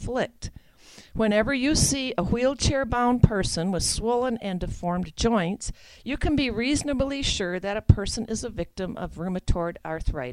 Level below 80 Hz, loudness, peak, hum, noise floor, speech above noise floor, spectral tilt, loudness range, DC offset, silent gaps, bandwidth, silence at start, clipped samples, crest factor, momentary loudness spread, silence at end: -34 dBFS; -25 LUFS; -4 dBFS; none; -51 dBFS; 26 dB; -4.5 dB/octave; 3 LU; under 0.1%; none; 14 kHz; 0 s; under 0.1%; 22 dB; 11 LU; 0 s